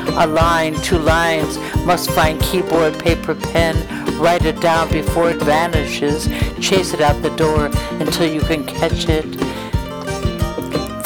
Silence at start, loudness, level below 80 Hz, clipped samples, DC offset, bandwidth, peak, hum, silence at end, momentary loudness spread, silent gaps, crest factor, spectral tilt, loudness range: 0 s; -17 LUFS; -28 dBFS; under 0.1%; under 0.1%; over 20 kHz; -2 dBFS; none; 0 s; 7 LU; none; 16 dB; -5 dB/octave; 3 LU